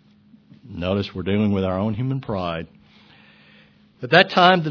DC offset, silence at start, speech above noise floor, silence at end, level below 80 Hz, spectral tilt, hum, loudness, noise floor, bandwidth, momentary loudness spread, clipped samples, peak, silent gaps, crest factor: under 0.1%; 0.65 s; 34 dB; 0 s; -52 dBFS; -7 dB/octave; none; -20 LUFS; -53 dBFS; 5.4 kHz; 18 LU; under 0.1%; 0 dBFS; none; 22 dB